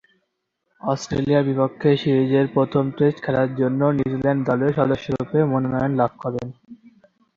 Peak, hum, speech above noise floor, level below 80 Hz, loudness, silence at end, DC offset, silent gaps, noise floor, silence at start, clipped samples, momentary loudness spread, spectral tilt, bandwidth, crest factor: -4 dBFS; none; 55 dB; -52 dBFS; -21 LUFS; 0.65 s; under 0.1%; none; -75 dBFS; 0.85 s; under 0.1%; 7 LU; -7.5 dB/octave; 7.4 kHz; 18 dB